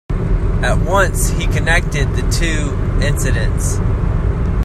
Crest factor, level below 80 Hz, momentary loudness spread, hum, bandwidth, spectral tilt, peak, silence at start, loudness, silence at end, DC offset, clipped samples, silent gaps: 14 dB; -18 dBFS; 4 LU; none; 14.5 kHz; -5 dB/octave; 0 dBFS; 0.1 s; -17 LUFS; 0 s; under 0.1%; under 0.1%; none